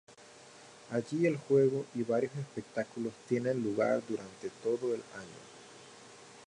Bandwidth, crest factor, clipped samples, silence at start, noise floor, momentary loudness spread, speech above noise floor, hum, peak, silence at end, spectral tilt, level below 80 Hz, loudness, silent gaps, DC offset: 11 kHz; 18 dB; under 0.1%; 0.1 s; -55 dBFS; 24 LU; 23 dB; none; -16 dBFS; 0 s; -6.5 dB/octave; -78 dBFS; -33 LUFS; none; under 0.1%